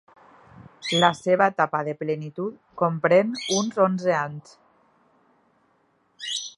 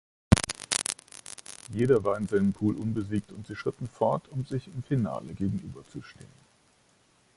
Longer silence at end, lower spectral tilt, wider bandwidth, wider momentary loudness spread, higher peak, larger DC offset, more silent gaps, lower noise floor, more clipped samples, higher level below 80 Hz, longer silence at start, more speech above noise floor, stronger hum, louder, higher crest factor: second, 0.05 s vs 1.1 s; second, -4 dB/octave vs -5.5 dB/octave; about the same, 11.5 kHz vs 11.5 kHz; second, 13 LU vs 18 LU; about the same, -2 dBFS vs 0 dBFS; neither; neither; about the same, -66 dBFS vs -65 dBFS; neither; second, -70 dBFS vs -46 dBFS; first, 0.55 s vs 0.3 s; first, 43 dB vs 35 dB; neither; first, -23 LUFS vs -29 LUFS; second, 24 dB vs 30 dB